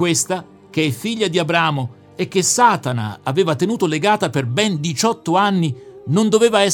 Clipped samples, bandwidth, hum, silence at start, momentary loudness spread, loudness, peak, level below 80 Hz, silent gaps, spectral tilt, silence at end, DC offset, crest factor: under 0.1%; 18.5 kHz; none; 0 s; 10 LU; -18 LUFS; 0 dBFS; -62 dBFS; none; -4 dB/octave; 0 s; under 0.1%; 18 dB